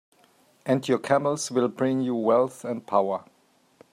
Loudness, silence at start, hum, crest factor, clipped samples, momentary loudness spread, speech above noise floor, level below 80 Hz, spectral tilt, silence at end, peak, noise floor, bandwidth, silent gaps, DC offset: -25 LUFS; 0.65 s; none; 20 dB; under 0.1%; 8 LU; 37 dB; -74 dBFS; -5.5 dB/octave; 0.7 s; -6 dBFS; -61 dBFS; 14.5 kHz; none; under 0.1%